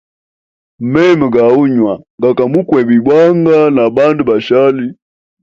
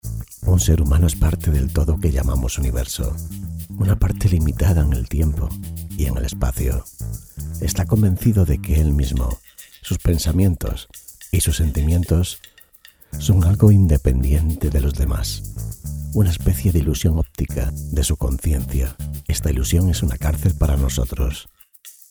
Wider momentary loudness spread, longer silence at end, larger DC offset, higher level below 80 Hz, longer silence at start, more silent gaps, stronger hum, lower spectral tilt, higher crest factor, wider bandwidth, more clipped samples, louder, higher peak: second, 7 LU vs 13 LU; first, 0.5 s vs 0.2 s; neither; second, -50 dBFS vs -22 dBFS; first, 0.8 s vs 0.05 s; first, 2.10-2.18 s vs none; neither; first, -8 dB/octave vs -6 dB/octave; second, 10 dB vs 18 dB; second, 7.4 kHz vs over 20 kHz; neither; first, -10 LUFS vs -20 LUFS; about the same, 0 dBFS vs 0 dBFS